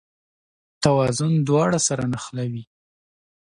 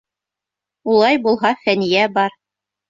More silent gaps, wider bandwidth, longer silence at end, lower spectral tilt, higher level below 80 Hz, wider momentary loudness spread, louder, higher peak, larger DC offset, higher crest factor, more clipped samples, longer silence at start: neither; first, 11.5 kHz vs 7.6 kHz; first, 0.9 s vs 0.6 s; about the same, -5 dB/octave vs -5.5 dB/octave; first, -54 dBFS vs -62 dBFS; first, 10 LU vs 7 LU; second, -21 LUFS vs -16 LUFS; about the same, -4 dBFS vs -2 dBFS; neither; about the same, 20 dB vs 16 dB; neither; about the same, 0.8 s vs 0.85 s